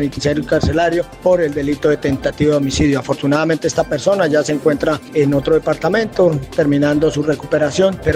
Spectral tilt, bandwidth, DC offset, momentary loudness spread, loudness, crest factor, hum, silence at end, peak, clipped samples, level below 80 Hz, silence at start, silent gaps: -6 dB/octave; 15.5 kHz; under 0.1%; 4 LU; -16 LUFS; 14 dB; none; 0 s; -2 dBFS; under 0.1%; -36 dBFS; 0 s; none